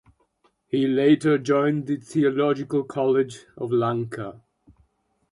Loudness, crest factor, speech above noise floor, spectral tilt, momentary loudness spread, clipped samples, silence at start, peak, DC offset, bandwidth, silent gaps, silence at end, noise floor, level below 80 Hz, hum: -23 LUFS; 16 dB; 45 dB; -7 dB/octave; 12 LU; under 0.1%; 0.75 s; -8 dBFS; under 0.1%; 11.5 kHz; none; 0.95 s; -68 dBFS; -64 dBFS; none